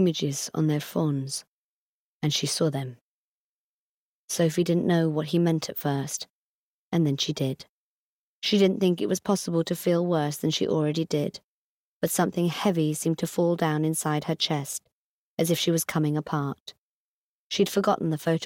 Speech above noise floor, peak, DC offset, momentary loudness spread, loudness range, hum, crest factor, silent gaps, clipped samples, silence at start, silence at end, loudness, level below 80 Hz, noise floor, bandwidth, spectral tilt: over 65 dB; -10 dBFS; under 0.1%; 10 LU; 4 LU; none; 16 dB; 1.47-2.20 s, 3.01-4.28 s, 6.30-6.91 s, 7.69-8.42 s, 11.44-12.00 s, 14.92-15.37 s, 16.60-16.66 s, 16.78-17.50 s; under 0.1%; 0 s; 0 s; -26 LUFS; -68 dBFS; under -90 dBFS; 17.5 kHz; -5 dB/octave